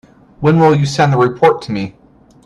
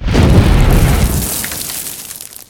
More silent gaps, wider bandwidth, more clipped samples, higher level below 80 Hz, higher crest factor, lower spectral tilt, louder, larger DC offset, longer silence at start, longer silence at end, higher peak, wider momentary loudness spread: neither; second, 11 kHz vs 20 kHz; second, under 0.1% vs 0.2%; second, -48 dBFS vs -16 dBFS; about the same, 14 dB vs 12 dB; first, -7 dB/octave vs -5 dB/octave; about the same, -13 LUFS vs -13 LUFS; neither; first, 0.4 s vs 0 s; first, 0.55 s vs 0.15 s; about the same, 0 dBFS vs 0 dBFS; about the same, 12 LU vs 13 LU